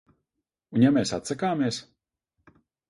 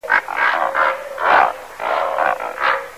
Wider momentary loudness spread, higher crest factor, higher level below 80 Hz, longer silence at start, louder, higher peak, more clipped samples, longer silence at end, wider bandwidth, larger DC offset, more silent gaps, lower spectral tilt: first, 9 LU vs 6 LU; about the same, 20 dB vs 16 dB; about the same, -62 dBFS vs -58 dBFS; first, 0.7 s vs 0.05 s; second, -25 LUFS vs -17 LUFS; second, -8 dBFS vs -2 dBFS; neither; first, 1.1 s vs 0 s; second, 11.5 kHz vs 16 kHz; second, under 0.1% vs 0.3%; neither; first, -5.5 dB/octave vs -2.5 dB/octave